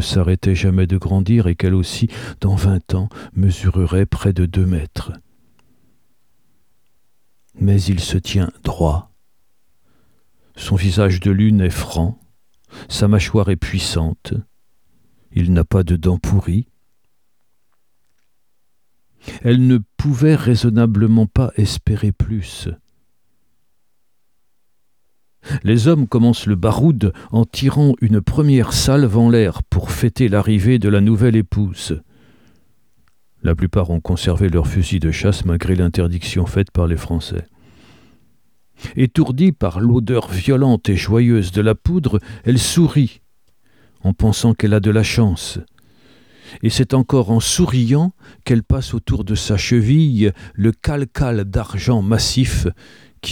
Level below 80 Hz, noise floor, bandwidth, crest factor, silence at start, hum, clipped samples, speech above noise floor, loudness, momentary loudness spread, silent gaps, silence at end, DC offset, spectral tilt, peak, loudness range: -32 dBFS; -72 dBFS; 16.5 kHz; 16 dB; 0 s; none; under 0.1%; 57 dB; -17 LUFS; 9 LU; none; 0 s; 0.2%; -6.5 dB/octave; -2 dBFS; 7 LU